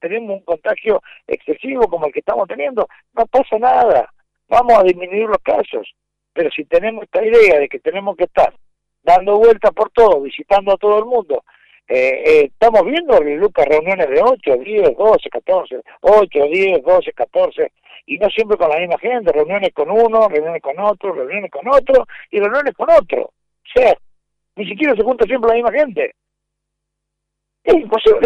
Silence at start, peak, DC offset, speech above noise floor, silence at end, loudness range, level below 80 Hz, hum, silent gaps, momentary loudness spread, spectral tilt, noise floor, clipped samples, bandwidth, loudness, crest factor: 0.05 s; -2 dBFS; under 0.1%; 63 dB; 0 s; 3 LU; -44 dBFS; 50 Hz at -70 dBFS; none; 11 LU; -5.5 dB/octave; -77 dBFS; under 0.1%; 7.6 kHz; -15 LUFS; 12 dB